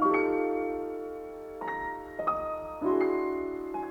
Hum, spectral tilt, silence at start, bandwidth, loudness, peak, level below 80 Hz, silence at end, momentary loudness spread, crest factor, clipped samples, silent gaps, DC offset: none; -7.5 dB/octave; 0 s; 16.5 kHz; -31 LUFS; -14 dBFS; -58 dBFS; 0 s; 11 LU; 16 dB; under 0.1%; none; under 0.1%